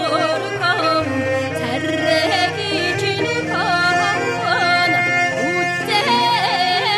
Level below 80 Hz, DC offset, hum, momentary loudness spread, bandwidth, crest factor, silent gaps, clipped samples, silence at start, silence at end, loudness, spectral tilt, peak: -56 dBFS; under 0.1%; none; 5 LU; 15 kHz; 14 dB; none; under 0.1%; 0 s; 0 s; -17 LUFS; -4 dB/octave; -4 dBFS